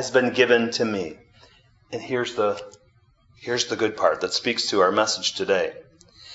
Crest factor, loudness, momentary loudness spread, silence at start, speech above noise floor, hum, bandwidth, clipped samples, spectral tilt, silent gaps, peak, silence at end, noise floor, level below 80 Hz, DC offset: 22 dB; -22 LUFS; 13 LU; 0 s; 36 dB; none; 8 kHz; under 0.1%; -3 dB/octave; none; -2 dBFS; 0 s; -59 dBFS; -64 dBFS; under 0.1%